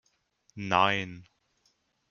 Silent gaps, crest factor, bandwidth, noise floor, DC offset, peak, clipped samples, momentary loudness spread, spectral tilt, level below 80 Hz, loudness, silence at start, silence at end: none; 24 dB; 7.2 kHz; -73 dBFS; under 0.1%; -8 dBFS; under 0.1%; 25 LU; -2 dB/octave; -68 dBFS; -27 LUFS; 0.55 s; 0.9 s